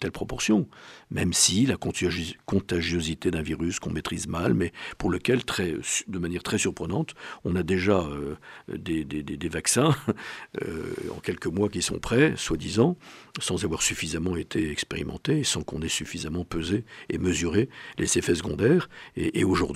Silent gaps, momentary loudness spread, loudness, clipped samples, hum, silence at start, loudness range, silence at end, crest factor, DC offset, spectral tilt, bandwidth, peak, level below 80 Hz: none; 11 LU; -27 LUFS; under 0.1%; none; 0 s; 3 LU; 0 s; 20 dB; under 0.1%; -4 dB/octave; 16 kHz; -6 dBFS; -48 dBFS